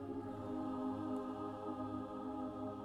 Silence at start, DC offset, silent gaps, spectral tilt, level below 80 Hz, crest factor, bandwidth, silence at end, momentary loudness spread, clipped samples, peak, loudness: 0 s; under 0.1%; none; -8.5 dB/octave; -68 dBFS; 12 dB; 10.5 kHz; 0 s; 3 LU; under 0.1%; -32 dBFS; -44 LUFS